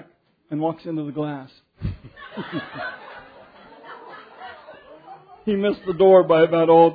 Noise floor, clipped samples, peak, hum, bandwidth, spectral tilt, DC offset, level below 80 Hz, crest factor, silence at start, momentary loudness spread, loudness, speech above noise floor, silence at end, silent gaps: -54 dBFS; under 0.1%; -2 dBFS; none; 4.9 kHz; -10 dB/octave; under 0.1%; -50 dBFS; 18 dB; 0.5 s; 26 LU; -20 LUFS; 36 dB; 0 s; none